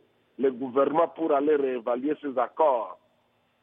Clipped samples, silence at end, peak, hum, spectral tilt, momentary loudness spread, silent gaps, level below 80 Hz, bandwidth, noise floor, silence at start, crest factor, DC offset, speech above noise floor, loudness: under 0.1%; 0.7 s; -10 dBFS; none; -9.5 dB/octave; 6 LU; none; -88 dBFS; 3.8 kHz; -68 dBFS; 0.4 s; 18 dB; under 0.1%; 43 dB; -26 LUFS